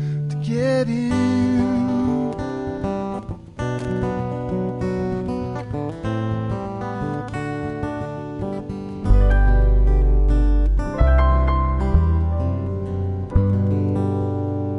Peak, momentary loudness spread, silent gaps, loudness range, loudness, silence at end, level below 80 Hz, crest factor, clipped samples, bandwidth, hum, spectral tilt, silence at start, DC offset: -4 dBFS; 10 LU; none; 7 LU; -22 LUFS; 0 s; -22 dBFS; 16 dB; under 0.1%; 9 kHz; none; -8.5 dB/octave; 0 s; under 0.1%